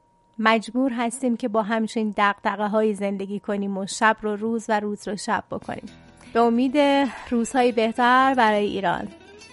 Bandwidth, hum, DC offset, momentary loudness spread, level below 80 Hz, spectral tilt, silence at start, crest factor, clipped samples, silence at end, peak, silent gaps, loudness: 11.5 kHz; none; under 0.1%; 10 LU; -58 dBFS; -4.5 dB/octave; 0.4 s; 20 dB; under 0.1%; 0.05 s; -2 dBFS; none; -22 LUFS